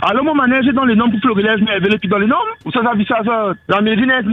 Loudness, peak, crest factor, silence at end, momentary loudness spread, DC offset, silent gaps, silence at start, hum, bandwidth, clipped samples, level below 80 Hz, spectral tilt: -14 LUFS; 0 dBFS; 14 dB; 0 s; 4 LU; under 0.1%; none; 0 s; none; 5.4 kHz; under 0.1%; -48 dBFS; -8 dB/octave